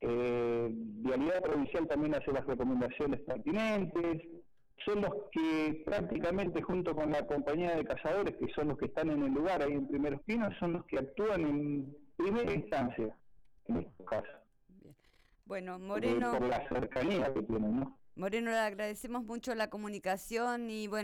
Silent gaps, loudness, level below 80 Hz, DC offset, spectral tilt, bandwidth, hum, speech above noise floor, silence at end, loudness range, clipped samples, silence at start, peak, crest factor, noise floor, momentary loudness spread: none; -35 LUFS; -56 dBFS; under 0.1%; -6.5 dB/octave; 17.5 kHz; none; 33 dB; 0 s; 4 LU; under 0.1%; 0 s; -24 dBFS; 12 dB; -67 dBFS; 7 LU